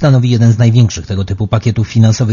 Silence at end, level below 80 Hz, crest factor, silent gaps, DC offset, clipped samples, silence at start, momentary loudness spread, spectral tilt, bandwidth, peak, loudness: 0 s; -36 dBFS; 10 dB; none; under 0.1%; 0.3%; 0 s; 8 LU; -7 dB/octave; 7.4 kHz; 0 dBFS; -11 LUFS